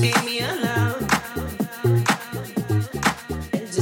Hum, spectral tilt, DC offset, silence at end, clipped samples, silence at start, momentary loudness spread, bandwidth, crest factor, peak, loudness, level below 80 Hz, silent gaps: none; -5 dB/octave; under 0.1%; 0 s; under 0.1%; 0 s; 8 LU; 17 kHz; 18 dB; -6 dBFS; -23 LUFS; -44 dBFS; none